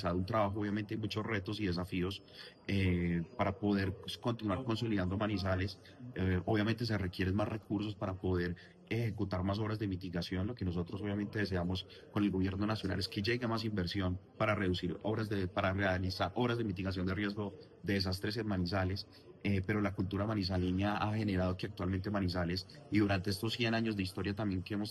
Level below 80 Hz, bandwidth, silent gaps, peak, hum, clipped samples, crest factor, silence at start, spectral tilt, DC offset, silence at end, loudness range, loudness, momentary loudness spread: -60 dBFS; 12.5 kHz; none; -18 dBFS; none; under 0.1%; 16 dB; 0 s; -7 dB/octave; under 0.1%; 0 s; 2 LU; -36 LUFS; 6 LU